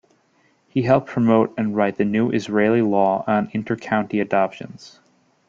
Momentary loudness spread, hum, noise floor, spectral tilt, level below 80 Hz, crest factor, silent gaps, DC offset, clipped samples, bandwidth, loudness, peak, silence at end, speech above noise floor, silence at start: 8 LU; none; -61 dBFS; -7.5 dB/octave; -58 dBFS; 18 dB; none; under 0.1%; under 0.1%; 7.6 kHz; -20 LUFS; -2 dBFS; 0.6 s; 42 dB; 0.75 s